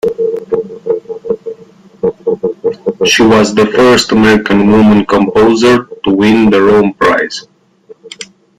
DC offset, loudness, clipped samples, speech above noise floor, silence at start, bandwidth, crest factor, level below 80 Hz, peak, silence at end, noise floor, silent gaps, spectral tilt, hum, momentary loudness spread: under 0.1%; -10 LUFS; under 0.1%; 32 dB; 0.05 s; 14.5 kHz; 10 dB; -40 dBFS; 0 dBFS; 0.35 s; -40 dBFS; none; -5 dB/octave; none; 12 LU